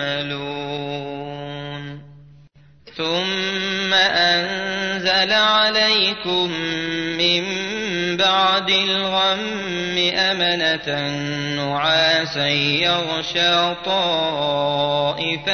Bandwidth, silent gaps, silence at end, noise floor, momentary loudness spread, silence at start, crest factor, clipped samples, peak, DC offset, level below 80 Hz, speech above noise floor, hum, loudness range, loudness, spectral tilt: 6.6 kHz; none; 0 s; -50 dBFS; 12 LU; 0 s; 16 dB; under 0.1%; -4 dBFS; 0.2%; -56 dBFS; 30 dB; none; 5 LU; -18 LUFS; -3.5 dB/octave